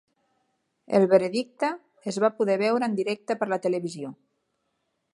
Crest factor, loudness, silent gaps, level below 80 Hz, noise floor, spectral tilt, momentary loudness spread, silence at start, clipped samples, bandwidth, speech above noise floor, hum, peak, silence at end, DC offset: 22 dB; -25 LUFS; none; -76 dBFS; -76 dBFS; -6 dB/octave; 14 LU; 0.9 s; under 0.1%; 11.5 kHz; 52 dB; none; -6 dBFS; 1 s; under 0.1%